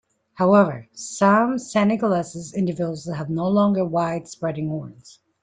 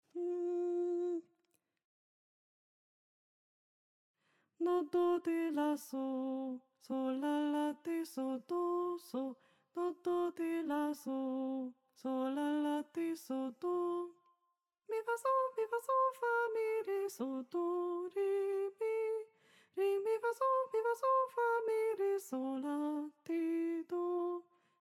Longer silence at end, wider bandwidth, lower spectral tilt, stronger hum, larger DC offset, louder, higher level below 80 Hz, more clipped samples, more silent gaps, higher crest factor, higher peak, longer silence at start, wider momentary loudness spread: about the same, 0.35 s vs 0.4 s; second, 9.4 kHz vs 15.5 kHz; first, -6.5 dB/octave vs -4.5 dB/octave; neither; neither; first, -21 LUFS vs -37 LUFS; first, -62 dBFS vs under -90 dBFS; neither; second, none vs 1.85-4.14 s; about the same, 16 dB vs 14 dB; first, -4 dBFS vs -24 dBFS; first, 0.35 s vs 0.15 s; first, 12 LU vs 8 LU